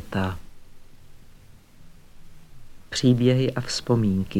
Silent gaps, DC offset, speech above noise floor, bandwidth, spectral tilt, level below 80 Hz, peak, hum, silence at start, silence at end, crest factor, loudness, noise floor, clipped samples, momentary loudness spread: none; under 0.1%; 26 dB; 14 kHz; -6 dB/octave; -48 dBFS; -8 dBFS; none; 0 s; 0 s; 18 dB; -23 LUFS; -48 dBFS; under 0.1%; 11 LU